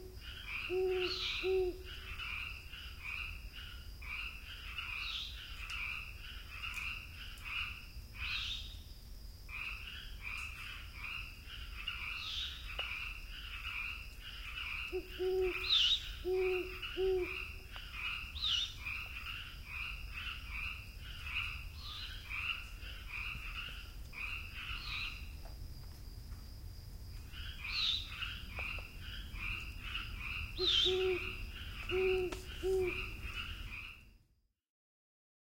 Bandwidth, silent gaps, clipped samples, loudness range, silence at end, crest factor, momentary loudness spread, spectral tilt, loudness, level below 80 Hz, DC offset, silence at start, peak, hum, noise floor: 16 kHz; none; under 0.1%; 8 LU; 1.3 s; 20 dB; 14 LU; -4 dB/octave; -39 LUFS; -50 dBFS; under 0.1%; 0 s; -20 dBFS; none; -75 dBFS